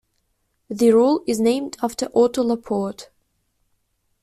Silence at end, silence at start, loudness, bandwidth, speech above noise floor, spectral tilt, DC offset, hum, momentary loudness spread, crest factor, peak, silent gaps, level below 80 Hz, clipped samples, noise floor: 1.2 s; 0.7 s; -20 LUFS; 14 kHz; 51 dB; -5.5 dB/octave; under 0.1%; none; 12 LU; 16 dB; -6 dBFS; none; -60 dBFS; under 0.1%; -70 dBFS